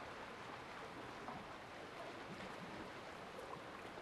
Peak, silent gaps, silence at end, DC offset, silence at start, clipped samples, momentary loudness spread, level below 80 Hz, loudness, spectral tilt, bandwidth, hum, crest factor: -36 dBFS; none; 0 s; under 0.1%; 0 s; under 0.1%; 2 LU; -72 dBFS; -51 LUFS; -4.5 dB/octave; 12.5 kHz; none; 16 dB